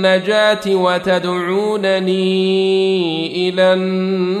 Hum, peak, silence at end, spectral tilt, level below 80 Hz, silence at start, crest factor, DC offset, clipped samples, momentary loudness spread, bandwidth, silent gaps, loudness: none; -2 dBFS; 0 s; -6 dB/octave; -60 dBFS; 0 s; 12 dB; under 0.1%; under 0.1%; 4 LU; 11.5 kHz; none; -15 LUFS